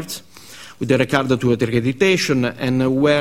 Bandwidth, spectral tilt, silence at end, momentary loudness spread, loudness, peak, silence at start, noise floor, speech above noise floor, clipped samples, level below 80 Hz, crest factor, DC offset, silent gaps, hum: 16 kHz; -5.5 dB/octave; 0 s; 15 LU; -18 LUFS; 0 dBFS; 0 s; -41 dBFS; 24 dB; under 0.1%; -48 dBFS; 18 dB; 0.4%; none; none